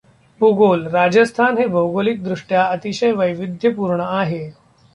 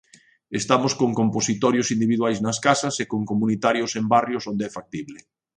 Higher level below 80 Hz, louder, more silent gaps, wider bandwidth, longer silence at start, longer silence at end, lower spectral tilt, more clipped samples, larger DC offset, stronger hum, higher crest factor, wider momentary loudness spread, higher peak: about the same, -58 dBFS vs -62 dBFS; first, -17 LUFS vs -22 LUFS; neither; about the same, 11 kHz vs 10 kHz; about the same, 0.4 s vs 0.5 s; about the same, 0.45 s vs 0.4 s; first, -6.5 dB/octave vs -4.5 dB/octave; neither; neither; neither; second, 14 dB vs 20 dB; second, 7 LU vs 10 LU; about the same, -2 dBFS vs -2 dBFS